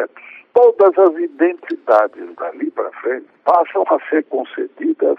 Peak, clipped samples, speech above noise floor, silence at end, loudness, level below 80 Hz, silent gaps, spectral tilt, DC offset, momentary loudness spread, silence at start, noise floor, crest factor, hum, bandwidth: -2 dBFS; under 0.1%; 25 dB; 0.05 s; -16 LUFS; -80 dBFS; none; -6.5 dB/octave; under 0.1%; 13 LU; 0 s; -40 dBFS; 14 dB; none; 5.6 kHz